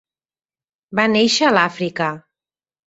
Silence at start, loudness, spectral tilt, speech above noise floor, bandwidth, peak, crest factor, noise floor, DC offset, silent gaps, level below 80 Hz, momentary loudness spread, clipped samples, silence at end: 0.9 s; -17 LUFS; -3.5 dB/octave; over 73 dB; 8.2 kHz; -2 dBFS; 18 dB; under -90 dBFS; under 0.1%; none; -62 dBFS; 10 LU; under 0.1%; 0.7 s